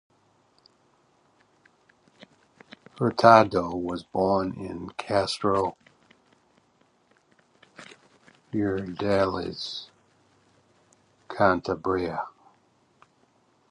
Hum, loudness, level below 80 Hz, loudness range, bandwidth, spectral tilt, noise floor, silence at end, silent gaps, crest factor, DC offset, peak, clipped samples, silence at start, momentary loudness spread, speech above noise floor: none; -25 LUFS; -56 dBFS; 10 LU; 11 kHz; -6 dB/octave; -65 dBFS; 1.4 s; none; 28 dB; under 0.1%; -2 dBFS; under 0.1%; 2.95 s; 19 LU; 41 dB